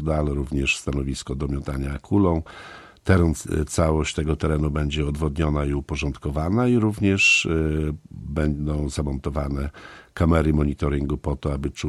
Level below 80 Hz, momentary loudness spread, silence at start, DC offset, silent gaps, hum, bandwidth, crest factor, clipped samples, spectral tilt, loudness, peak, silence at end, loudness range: -32 dBFS; 10 LU; 0 s; under 0.1%; none; none; 12.5 kHz; 20 dB; under 0.1%; -6 dB/octave; -23 LUFS; -4 dBFS; 0 s; 3 LU